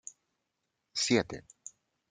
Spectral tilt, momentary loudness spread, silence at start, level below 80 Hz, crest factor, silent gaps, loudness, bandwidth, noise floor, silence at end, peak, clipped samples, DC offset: -3.5 dB/octave; 22 LU; 0.95 s; -68 dBFS; 24 dB; none; -31 LUFS; 9.6 kHz; -83 dBFS; 0.7 s; -14 dBFS; under 0.1%; under 0.1%